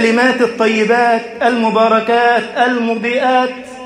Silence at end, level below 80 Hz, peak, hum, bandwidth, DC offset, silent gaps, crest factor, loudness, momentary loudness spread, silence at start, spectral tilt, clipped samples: 0 s; -58 dBFS; 0 dBFS; none; 11 kHz; under 0.1%; none; 12 dB; -13 LUFS; 4 LU; 0 s; -4.5 dB/octave; under 0.1%